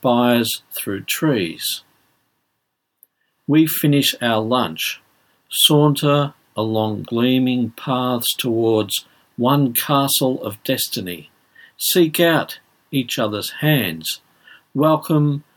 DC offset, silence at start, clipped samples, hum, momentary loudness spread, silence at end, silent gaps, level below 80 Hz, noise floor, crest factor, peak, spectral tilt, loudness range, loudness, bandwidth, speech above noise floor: under 0.1%; 0 s; under 0.1%; none; 11 LU; 0.15 s; none; -68 dBFS; -74 dBFS; 18 dB; -2 dBFS; -4.5 dB/octave; 3 LU; -18 LUFS; 19 kHz; 56 dB